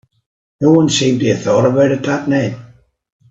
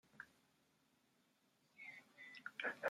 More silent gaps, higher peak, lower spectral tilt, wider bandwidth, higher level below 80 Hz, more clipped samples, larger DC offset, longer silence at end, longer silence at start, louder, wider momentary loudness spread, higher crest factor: neither; first, 0 dBFS vs -28 dBFS; first, -5.5 dB/octave vs -3 dB/octave; second, 8 kHz vs 16 kHz; first, -52 dBFS vs under -90 dBFS; neither; neither; first, 0.65 s vs 0 s; first, 0.6 s vs 0.15 s; first, -14 LUFS vs -53 LUFS; second, 6 LU vs 14 LU; second, 14 dB vs 24 dB